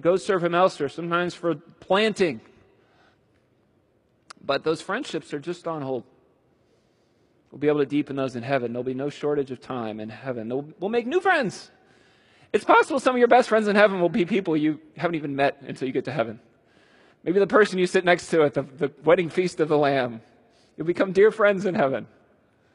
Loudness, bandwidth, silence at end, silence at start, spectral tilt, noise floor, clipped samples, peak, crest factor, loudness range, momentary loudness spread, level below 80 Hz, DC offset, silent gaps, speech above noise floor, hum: -23 LUFS; 11.5 kHz; 0.7 s; 0.05 s; -5.5 dB/octave; -65 dBFS; under 0.1%; -2 dBFS; 22 dB; 10 LU; 13 LU; -68 dBFS; under 0.1%; none; 42 dB; none